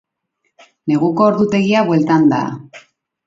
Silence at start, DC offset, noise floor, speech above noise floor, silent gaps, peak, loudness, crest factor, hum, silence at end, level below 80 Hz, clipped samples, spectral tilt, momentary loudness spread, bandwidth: 0.85 s; under 0.1%; -70 dBFS; 55 dB; none; 0 dBFS; -14 LUFS; 16 dB; none; 0.45 s; -58 dBFS; under 0.1%; -7.5 dB/octave; 12 LU; 7.8 kHz